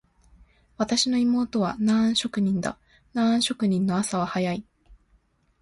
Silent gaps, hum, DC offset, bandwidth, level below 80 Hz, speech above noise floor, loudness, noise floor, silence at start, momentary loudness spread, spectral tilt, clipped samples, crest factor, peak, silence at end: none; none; under 0.1%; 11.5 kHz; -58 dBFS; 40 dB; -24 LUFS; -64 dBFS; 0.8 s; 9 LU; -4.5 dB/octave; under 0.1%; 16 dB; -10 dBFS; 0.65 s